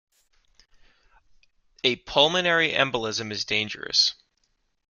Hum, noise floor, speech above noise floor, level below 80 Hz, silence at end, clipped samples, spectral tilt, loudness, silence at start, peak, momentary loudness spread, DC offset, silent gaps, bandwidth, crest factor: none; -71 dBFS; 47 dB; -60 dBFS; 0.8 s; under 0.1%; -2.5 dB/octave; -23 LUFS; 1.85 s; -2 dBFS; 7 LU; under 0.1%; none; 7.4 kHz; 24 dB